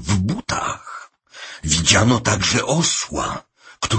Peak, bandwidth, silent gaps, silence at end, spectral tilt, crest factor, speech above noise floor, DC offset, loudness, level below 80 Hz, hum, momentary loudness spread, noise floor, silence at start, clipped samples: 0 dBFS; 8.8 kHz; none; 0 s; -3.5 dB/octave; 20 dB; 22 dB; under 0.1%; -18 LUFS; -40 dBFS; none; 20 LU; -40 dBFS; 0 s; under 0.1%